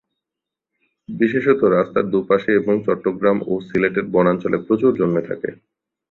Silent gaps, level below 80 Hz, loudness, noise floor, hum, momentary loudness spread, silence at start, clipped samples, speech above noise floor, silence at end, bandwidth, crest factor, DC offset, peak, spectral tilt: none; -56 dBFS; -18 LUFS; -85 dBFS; none; 6 LU; 1.1 s; under 0.1%; 67 dB; 0.6 s; 4.2 kHz; 16 dB; under 0.1%; -2 dBFS; -9.5 dB/octave